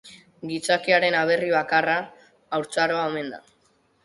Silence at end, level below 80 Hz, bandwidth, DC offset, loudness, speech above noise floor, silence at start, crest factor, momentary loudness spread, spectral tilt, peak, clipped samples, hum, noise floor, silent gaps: 0.65 s; -68 dBFS; 11.5 kHz; under 0.1%; -23 LUFS; 41 dB; 0.05 s; 18 dB; 16 LU; -4 dB/octave; -6 dBFS; under 0.1%; none; -64 dBFS; none